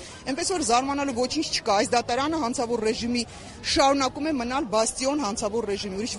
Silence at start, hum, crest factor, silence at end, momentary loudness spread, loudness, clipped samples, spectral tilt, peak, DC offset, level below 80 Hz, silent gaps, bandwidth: 0 s; none; 18 dB; 0 s; 7 LU; -25 LUFS; under 0.1%; -3 dB/octave; -8 dBFS; under 0.1%; -50 dBFS; none; 11.5 kHz